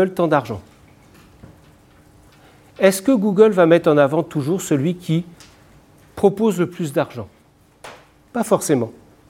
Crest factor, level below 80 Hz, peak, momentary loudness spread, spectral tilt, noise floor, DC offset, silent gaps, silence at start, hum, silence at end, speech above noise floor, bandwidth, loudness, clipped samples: 18 dB; -58 dBFS; 0 dBFS; 17 LU; -6 dB/octave; -53 dBFS; under 0.1%; none; 0 s; none; 0.4 s; 36 dB; 17 kHz; -18 LUFS; under 0.1%